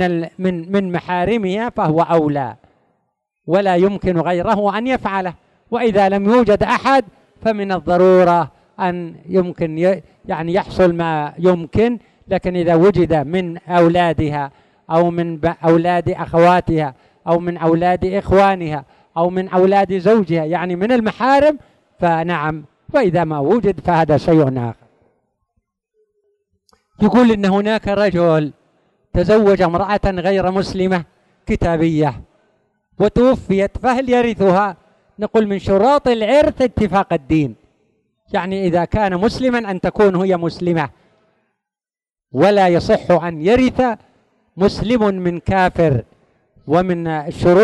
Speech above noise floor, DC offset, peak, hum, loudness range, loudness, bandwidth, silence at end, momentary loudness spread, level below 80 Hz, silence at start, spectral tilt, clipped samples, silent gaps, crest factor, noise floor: over 75 dB; under 0.1%; -2 dBFS; none; 3 LU; -16 LUFS; 10.5 kHz; 0 s; 9 LU; -38 dBFS; 0 s; -7.5 dB/octave; under 0.1%; none; 14 dB; under -90 dBFS